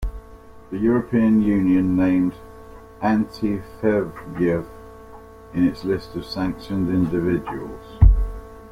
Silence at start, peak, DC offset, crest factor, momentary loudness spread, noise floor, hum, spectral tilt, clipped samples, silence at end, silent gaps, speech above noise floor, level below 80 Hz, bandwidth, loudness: 0 s; -2 dBFS; under 0.1%; 18 dB; 16 LU; -43 dBFS; none; -9 dB/octave; under 0.1%; 0 s; none; 22 dB; -28 dBFS; 12.5 kHz; -21 LUFS